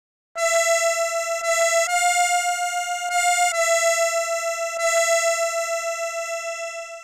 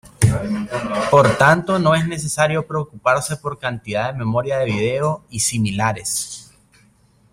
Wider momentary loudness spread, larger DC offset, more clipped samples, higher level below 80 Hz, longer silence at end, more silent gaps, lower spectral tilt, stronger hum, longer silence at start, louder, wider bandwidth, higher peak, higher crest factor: about the same, 8 LU vs 10 LU; neither; neither; second, -72 dBFS vs -46 dBFS; second, 0 s vs 0.9 s; neither; second, 5 dB/octave vs -4.5 dB/octave; neither; first, 0.35 s vs 0.05 s; about the same, -21 LUFS vs -19 LUFS; about the same, 16 kHz vs 16 kHz; second, -8 dBFS vs 0 dBFS; about the same, 14 dB vs 18 dB